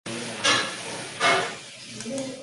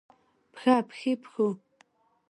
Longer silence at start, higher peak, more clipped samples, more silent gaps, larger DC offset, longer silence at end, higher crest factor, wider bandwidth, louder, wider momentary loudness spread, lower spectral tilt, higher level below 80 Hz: second, 0.05 s vs 0.55 s; about the same, -8 dBFS vs -8 dBFS; neither; neither; neither; second, 0 s vs 0.75 s; about the same, 20 dB vs 22 dB; about the same, 11.5 kHz vs 11.5 kHz; first, -25 LUFS vs -28 LUFS; first, 15 LU vs 7 LU; second, -1.5 dB/octave vs -6 dB/octave; first, -68 dBFS vs -82 dBFS